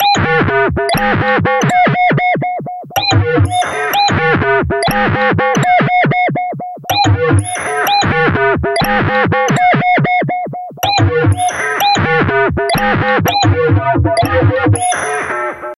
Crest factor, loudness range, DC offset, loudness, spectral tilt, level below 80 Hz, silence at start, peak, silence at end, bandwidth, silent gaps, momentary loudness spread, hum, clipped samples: 10 dB; 1 LU; under 0.1%; -12 LUFS; -5 dB/octave; -34 dBFS; 0 s; -2 dBFS; 0.05 s; 13 kHz; none; 6 LU; none; under 0.1%